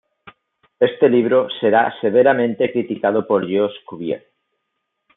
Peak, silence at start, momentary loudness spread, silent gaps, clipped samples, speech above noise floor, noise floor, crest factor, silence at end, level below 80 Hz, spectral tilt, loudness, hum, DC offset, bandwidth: -2 dBFS; 0.25 s; 12 LU; none; under 0.1%; 58 dB; -75 dBFS; 16 dB; 1 s; -68 dBFS; -10.5 dB/octave; -17 LUFS; none; under 0.1%; 4 kHz